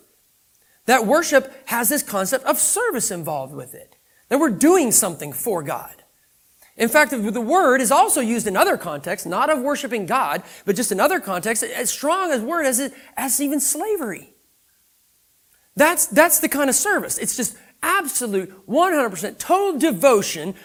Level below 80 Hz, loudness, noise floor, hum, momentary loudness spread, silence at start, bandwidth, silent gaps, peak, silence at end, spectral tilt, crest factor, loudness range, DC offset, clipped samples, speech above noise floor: -62 dBFS; -19 LUFS; -61 dBFS; none; 11 LU; 0.85 s; 19.5 kHz; none; 0 dBFS; 0.1 s; -2.5 dB/octave; 20 dB; 3 LU; under 0.1%; under 0.1%; 41 dB